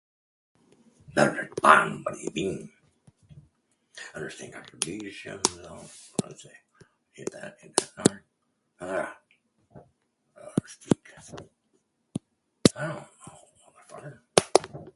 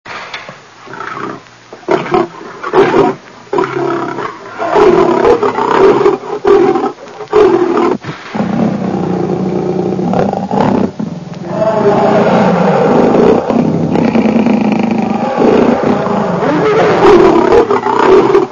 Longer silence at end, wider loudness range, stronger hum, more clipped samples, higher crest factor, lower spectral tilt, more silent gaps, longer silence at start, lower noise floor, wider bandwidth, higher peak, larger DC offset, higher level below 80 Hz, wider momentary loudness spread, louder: about the same, 0.1 s vs 0 s; first, 10 LU vs 5 LU; neither; second, under 0.1% vs 0.6%; first, 30 dB vs 10 dB; second, -3.5 dB/octave vs -7 dB/octave; neither; first, 1.1 s vs 0.05 s; first, -75 dBFS vs -34 dBFS; first, 12 kHz vs 7.4 kHz; about the same, 0 dBFS vs 0 dBFS; neither; second, -62 dBFS vs -42 dBFS; first, 23 LU vs 14 LU; second, -27 LUFS vs -10 LUFS